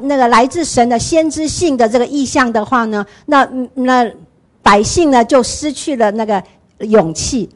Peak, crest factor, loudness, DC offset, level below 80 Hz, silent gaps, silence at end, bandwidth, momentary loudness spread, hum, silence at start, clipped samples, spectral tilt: 0 dBFS; 12 dB; -13 LUFS; under 0.1%; -38 dBFS; none; 0.1 s; 11.5 kHz; 8 LU; none; 0 s; under 0.1%; -4 dB/octave